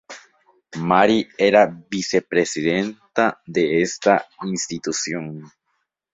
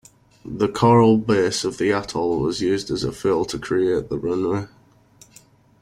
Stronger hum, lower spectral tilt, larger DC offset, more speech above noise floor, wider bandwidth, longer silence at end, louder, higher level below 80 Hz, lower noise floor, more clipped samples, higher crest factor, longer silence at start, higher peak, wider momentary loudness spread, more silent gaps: neither; second, -4 dB/octave vs -6 dB/octave; neither; first, 53 dB vs 32 dB; second, 8.4 kHz vs 15 kHz; second, 0.65 s vs 1.15 s; about the same, -20 LUFS vs -20 LUFS; second, -60 dBFS vs -50 dBFS; first, -73 dBFS vs -52 dBFS; neither; about the same, 20 dB vs 16 dB; second, 0.1 s vs 0.45 s; about the same, -2 dBFS vs -4 dBFS; first, 13 LU vs 10 LU; neither